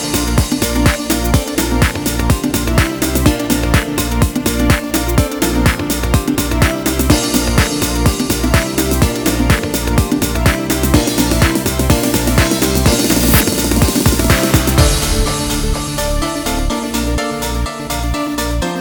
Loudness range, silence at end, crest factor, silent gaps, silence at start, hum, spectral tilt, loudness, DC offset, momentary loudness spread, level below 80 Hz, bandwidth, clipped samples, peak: 3 LU; 0 s; 14 dB; none; 0 s; none; -4.5 dB/octave; -14 LUFS; under 0.1%; 6 LU; -20 dBFS; over 20 kHz; under 0.1%; 0 dBFS